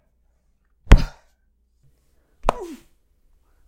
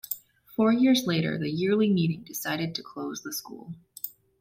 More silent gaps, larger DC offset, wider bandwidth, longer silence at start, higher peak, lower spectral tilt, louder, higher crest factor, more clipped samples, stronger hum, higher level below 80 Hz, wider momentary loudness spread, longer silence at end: neither; neither; second, 9.2 kHz vs 16.5 kHz; first, 0.9 s vs 0.1 s; first, 0 dBFS vs -12 dBFS; about the same, -6 dB/octave vs -5.5 dB/octave; first, -22 LUFS vs -27 LUFS; first, 22 dB vs 16 dB; neither; neither; first, -22 dBFS vs -66 dBFS; first, 20 LU vs 16 LU; first, 0.95 s vs 0.3 s